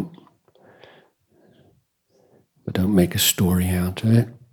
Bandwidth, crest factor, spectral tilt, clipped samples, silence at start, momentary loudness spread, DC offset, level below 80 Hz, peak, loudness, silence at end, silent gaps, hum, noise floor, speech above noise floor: 19 kHz; 20 dB; -5 dB/octave; under 0.1%; 0 s; 12 LU; under 0.1%; -48 dBFS; -4 dBFS; -20 LUFS; 0.2 s; none; none; -63 dBFS; 44 dB